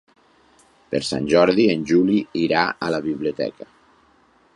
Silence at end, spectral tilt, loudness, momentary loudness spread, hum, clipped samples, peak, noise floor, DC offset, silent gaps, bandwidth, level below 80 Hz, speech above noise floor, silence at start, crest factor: 1.05 s; -5.5 dB/octave; -20 LUFS; 10 LU; none; under 0.1%; -2 dBFS; -57 dBFS; under 0.1%; none; 11.5 kHz; -56 dBFS; 38 dB; 0.9 s; 20 dB